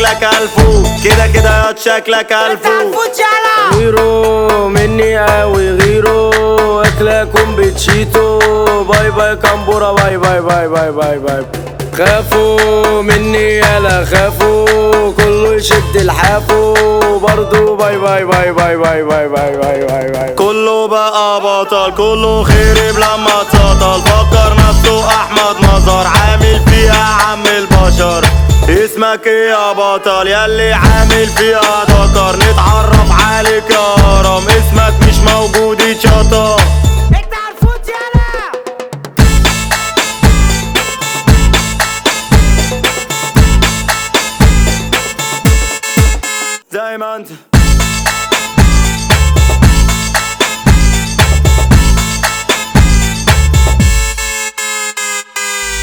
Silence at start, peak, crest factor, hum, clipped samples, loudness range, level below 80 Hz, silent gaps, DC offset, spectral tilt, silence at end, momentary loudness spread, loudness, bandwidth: 0 s; 0 dBFS; 8 dB; none; 0.4%; 3 LU; -14 dBFS; none; under 0.1%; -4.5 dB/octave; 0 s; 6 LU; -9 LUFS; over 20 kHz